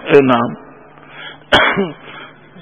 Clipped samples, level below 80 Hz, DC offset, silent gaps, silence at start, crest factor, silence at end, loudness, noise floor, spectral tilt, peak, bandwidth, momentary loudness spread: 0.2%; -44 dBFS; 0.3%; none; 0 s; 16 dB; 0.35 s; -13 LUFS; -40 dBFS; -5.5 dB/octave; 0 dBFS; 11 kHz; 23 LU